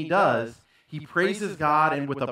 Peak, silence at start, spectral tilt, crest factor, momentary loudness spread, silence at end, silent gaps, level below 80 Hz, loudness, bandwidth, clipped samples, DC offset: -8 dBFS; 0 s; -6 dB/octave; 16 dB; 16 LU; 0 s; none; -66 dBFS; -24 LUFS; 15 kHz; under 0.1%; under 0.1%